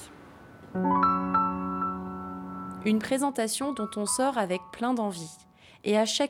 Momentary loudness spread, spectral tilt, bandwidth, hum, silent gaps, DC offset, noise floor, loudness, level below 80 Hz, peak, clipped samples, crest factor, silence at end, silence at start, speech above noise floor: 14 LU; -4 dB/octave; 16.5 kHz; none; none; under 0.1%; -49 dBFS; -28 LUFS; -60 dBFS; -12 dBFS; under 0.1%; 18 dB; 0 s; 0 s; 22 dB